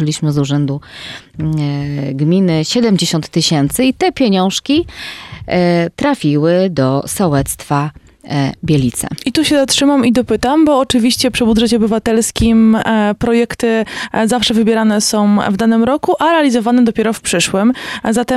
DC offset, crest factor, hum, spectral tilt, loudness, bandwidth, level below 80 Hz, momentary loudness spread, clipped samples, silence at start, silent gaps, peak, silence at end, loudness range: under 0.1%; 12 dB; none; -5 dB/octave; -13 LUFS; 15 kHz; -38 dBFS; 7 LU; under 0.1%; 0 s; none; 0 dBFS; 0 s; 3 LU